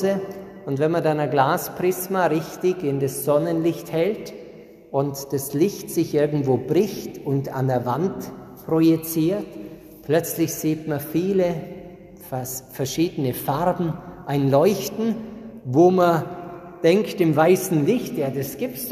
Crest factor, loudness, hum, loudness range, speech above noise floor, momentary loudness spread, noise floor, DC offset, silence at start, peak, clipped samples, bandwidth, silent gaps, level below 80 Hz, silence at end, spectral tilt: 18 dB; -22 LUFS; none; 5 LU; 22 dB; 16 LU; -43 dBFS; under 0.1%; 0 s; -4 dBFS; under 0.1%; 14.5 kHz; none; -56 dBFS; 0 s; -6 dB/octave